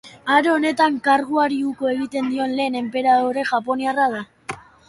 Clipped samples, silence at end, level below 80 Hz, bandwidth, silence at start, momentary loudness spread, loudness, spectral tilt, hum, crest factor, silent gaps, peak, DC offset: under 0.1%; 0.3 s; -62 dBFS; 11.5 kHz; 0.05 s; 7 LU; -20 LUFS; -4.5 dB/octave; none; 18 dB; none; -2 dBFS; under 0.1%